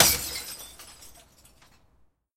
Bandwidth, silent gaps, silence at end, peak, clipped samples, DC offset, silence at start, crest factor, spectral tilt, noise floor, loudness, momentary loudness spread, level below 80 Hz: 16.5 kHz; none; 1.25 s; 0 dBFS; under 0.1%; under 0.1%; 0 s; 30 dB; -1 dB/octave; -64 dBFS; -27 LUFS; 25 LU; -52 dBFS